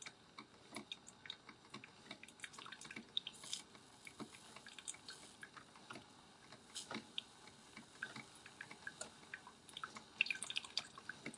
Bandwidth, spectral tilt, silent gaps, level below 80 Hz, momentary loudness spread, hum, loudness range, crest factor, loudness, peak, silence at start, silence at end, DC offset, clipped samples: 12 kHz; -1 dB/octave; none; -86 dBFS; 16 LU; none; 8 LU; 34 dB; -49 LUFS; -18 dBFS; 0 s; 0 s; under 0.1%; under 0.1%